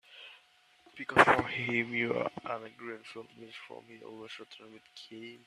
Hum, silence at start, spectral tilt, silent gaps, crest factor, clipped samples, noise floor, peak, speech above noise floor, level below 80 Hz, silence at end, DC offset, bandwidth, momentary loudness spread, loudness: none; 0.15 s; -5 dB/octave; none; 28 dB; under 0.1%; -65 dBFS; -6 dBFS; 31 dB; -68 dBFS; 0.1 s; under 0.1%; 14 kHz; 26 LU; -29 LUFS